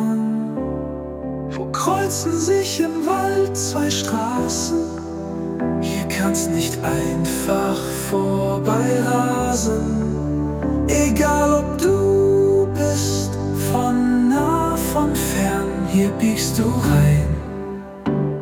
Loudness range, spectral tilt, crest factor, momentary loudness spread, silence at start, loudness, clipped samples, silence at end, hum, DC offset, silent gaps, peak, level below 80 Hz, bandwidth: 4 LU; -5.5 dB/octave; 14 dB; 9 LU; 0 s; -20 LUFS; under 0.1%; 0 s; none; under 0.1%; none; -4 dBFS; -36 dBFS; 19 kHz